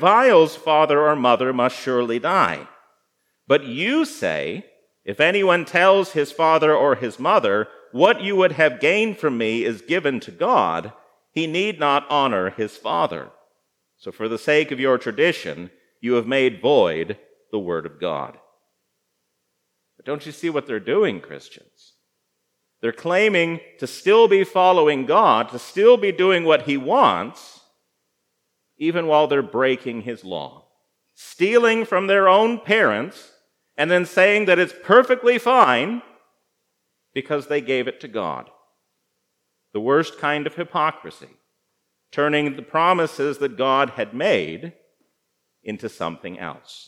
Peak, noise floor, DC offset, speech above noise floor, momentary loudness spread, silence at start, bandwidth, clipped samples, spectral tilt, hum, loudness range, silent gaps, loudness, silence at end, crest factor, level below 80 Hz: 0 dBFS; -74 dBFS; under 0.1%; 55 dB; 16 LU; 0 s; 13.5 kHz; under 0.1%; -5 dB/octave; none; 9 LU; none; -19 LUFS; 0.1 s; 20 dB; -74 dBFS